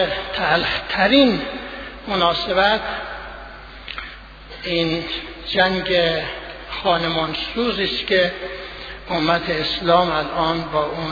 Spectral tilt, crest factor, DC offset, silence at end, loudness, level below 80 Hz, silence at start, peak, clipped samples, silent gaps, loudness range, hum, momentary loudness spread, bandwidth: -6 dB/octave; 20 dB; under 0.1%; 0 s; -19 LUFS; -42 dBFS; 0 s; -2 dBFS; under 0.1%; none; 4 LU; none; 15 LU; 5 kHz